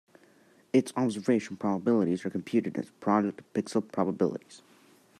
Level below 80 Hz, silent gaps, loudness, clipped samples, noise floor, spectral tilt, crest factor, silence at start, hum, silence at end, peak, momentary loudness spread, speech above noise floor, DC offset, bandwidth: -78 dBFS; none; -29 LUFS; under 0.1%; -61 dBFS; -7 dB/octave; 18 dB; 0.75 s; none; 0.6 s; -12 dBFS; 6 LU; 32 dB; under 0.1%; 12.5 kHz